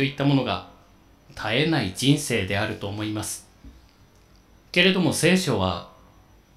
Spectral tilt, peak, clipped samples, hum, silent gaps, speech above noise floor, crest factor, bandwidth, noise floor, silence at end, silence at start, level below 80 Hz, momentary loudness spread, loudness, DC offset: -4.5 dB/octave; -2 dBFS; under 0.1%; none; none; 32 dB; 22 dB; 15.5 kHz; -55 dBFS; 0.65 s; 0 s; -54 dBFS; 13 LU; -23 LUFS; under 0.1%